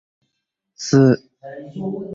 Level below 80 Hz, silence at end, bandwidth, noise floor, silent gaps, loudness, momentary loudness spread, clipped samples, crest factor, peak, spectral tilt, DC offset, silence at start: -58 dBFS; 0 s; 7.8 kHz; -77 dBFS; none; -18 LUFS; 22 LU; under 0.1%; 18 dB; -2 dBFS; -6.5 dB/octave; under 0.1%; 0.8 s